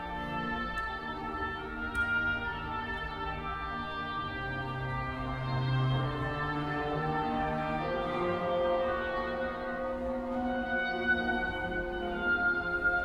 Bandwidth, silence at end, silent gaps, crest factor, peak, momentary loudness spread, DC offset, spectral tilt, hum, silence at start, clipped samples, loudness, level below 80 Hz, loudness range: 11 kHz; 0 s; none; 14 dB; -18 dBFS; 7 LU; under 0.1%; -7 dB/octave; none; 0 s; under 0.1%; -33 LUFS; -48 dBFS; 2 LU